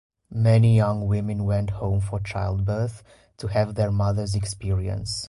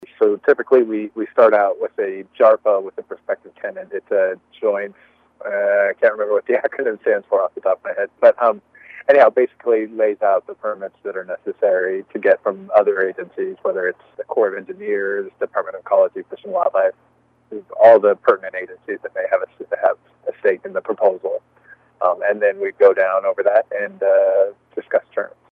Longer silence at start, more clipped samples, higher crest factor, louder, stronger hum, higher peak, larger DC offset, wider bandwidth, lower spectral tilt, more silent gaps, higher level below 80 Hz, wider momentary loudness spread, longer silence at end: first, 0.3 s vs 0 s; neither; about the same, 14 dB vs 18 dB; second, -24 LUFS vs -18 LUFS; neither; second, -8 dBFS vs 0 dBFS; neither; first, 11.5 kHz vs 4.5 kHz; about the same, -7 dB/octave vs -7 dB/octave; neither; first, -40 dBFS vs -74 dBFS; second, 10 LU vs 14 LU; second, 0 s vs 0.25 s